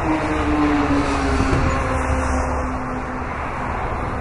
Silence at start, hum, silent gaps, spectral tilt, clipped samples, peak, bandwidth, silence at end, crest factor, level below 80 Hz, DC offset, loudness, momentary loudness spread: 0 s; none; none; -6.5 dB/octave; under 0.1%; -2 dBFS; 11.5 kHz; 0 s; 18 dB; -26 dBFS; under 0.1%; -21 LUFS; 8 LU